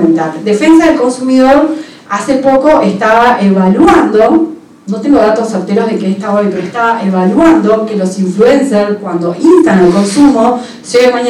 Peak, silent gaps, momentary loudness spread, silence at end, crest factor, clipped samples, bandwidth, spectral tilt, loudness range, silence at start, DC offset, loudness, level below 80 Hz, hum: 0 dBFS; none; 8 LU; 0 s; 8 dB; 1%; 12 kHz; -6 dB/octave; 2 LU; 0 s; under 0.1%; -9 LUFS; -40 dBFS; none